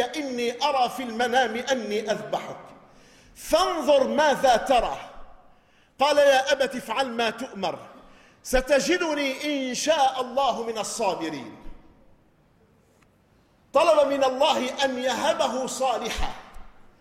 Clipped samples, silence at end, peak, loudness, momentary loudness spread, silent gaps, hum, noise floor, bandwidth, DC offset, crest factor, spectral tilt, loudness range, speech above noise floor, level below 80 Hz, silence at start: under 0.1%; 0.2 s; -8 dBFS; -24 LUFS; 12 LU; none; none; -61 dBFS; 16 kHz; under 0.1%; 18 dB; -2.5 dB/octave; 4 LU; 37 dB; -46 dBFS; 0 s